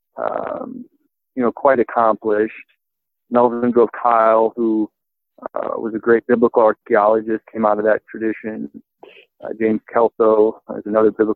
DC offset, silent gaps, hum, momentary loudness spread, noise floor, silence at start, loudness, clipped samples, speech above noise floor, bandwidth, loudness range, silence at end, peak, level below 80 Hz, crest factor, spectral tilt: under 0.1%; none; none; 15 LU; -80 dBFS; 0.15 s; -17 LUFS; under 0.1%; 64 dB; 4.2 kHz; 3 LU; 0 s; -2 dBFS; -62 dBFS; 16 dB; -10 dB/octave